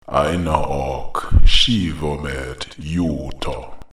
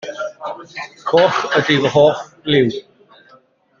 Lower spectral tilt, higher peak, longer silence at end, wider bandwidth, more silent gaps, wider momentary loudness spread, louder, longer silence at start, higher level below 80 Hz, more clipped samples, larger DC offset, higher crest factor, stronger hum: about the same, -5 dB/octave vs -5.5 dB/octave; about the same, 0 dBFS vs -2 dBFS; second, 0.1 s vs 1 s; first, 12 kHz vs 7.4 kHz; neither; second, 13 LU vs 16 LU; second, -20 LUFS vs -16 LUFS; about the same, 0.1 s vs 0.05 s; first, -22 dBFS vs -56 dBFS; neither; first, 0.6% vs under 0.1%; about the same, 16 dB vs 16 dB; neither